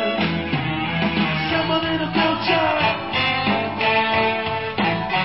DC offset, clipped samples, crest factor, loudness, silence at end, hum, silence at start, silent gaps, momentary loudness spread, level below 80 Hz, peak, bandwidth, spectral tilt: 0.4%; under 0.1%; 16 dB; -20 LUFS; 0 s; none; 0 s; none; 5 LU; -44 dBFS; -6 dBFS; 5.8 kHz; -10 dB/octave